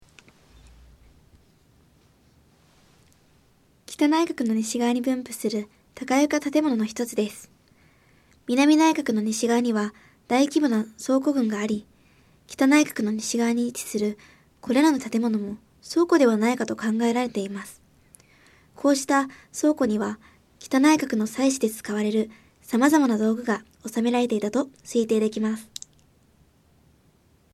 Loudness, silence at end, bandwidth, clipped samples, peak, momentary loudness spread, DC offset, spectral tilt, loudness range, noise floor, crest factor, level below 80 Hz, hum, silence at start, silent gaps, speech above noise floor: -23 LUFS; 1.9 s; 15 kHz; under 0.1%; -6 dBFS; 13 LU; under 0.1%; -4.5 dB/octave; 4 LU; -60 dBFS; 18 dB; -64 dBFS; none; 3.9 s; none; 38 dB